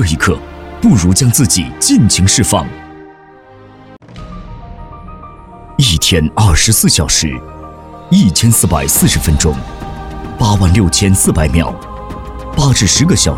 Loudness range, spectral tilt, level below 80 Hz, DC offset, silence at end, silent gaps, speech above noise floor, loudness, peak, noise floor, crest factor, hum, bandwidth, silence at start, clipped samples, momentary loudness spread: 6 LU; -4 dB/octave; -24 dBFS; under 0.1%; 0 s; none; 28 dB; -10 LUFS; 0 dBFS; -38 dBFS; 12 dB; none; 17 kHz; 0 s; under 0.1%; 22 LU